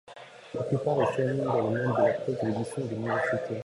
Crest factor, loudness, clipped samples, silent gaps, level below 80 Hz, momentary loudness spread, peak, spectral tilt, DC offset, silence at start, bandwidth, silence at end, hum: 16 dB; -28 LUFS; under 0.1%; none; -64 dBFS; 10 LU; -12 dBFS; -7.5 dB/octave; under 0.1%; 0.05 s; 11.5 kHz; 0.05 s; none